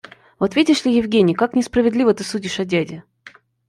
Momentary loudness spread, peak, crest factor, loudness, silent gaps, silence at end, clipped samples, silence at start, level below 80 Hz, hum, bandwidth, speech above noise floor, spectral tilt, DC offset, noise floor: 8 LU; -2 dBFS; 16 dB; -18 LUFS; none; 0.4 s; under 0.1%; 0.4 s; -52 dBFS; none; 12 kHz; 29 dB; -5.5 dB/octave; under 0.1%; -47 dBFS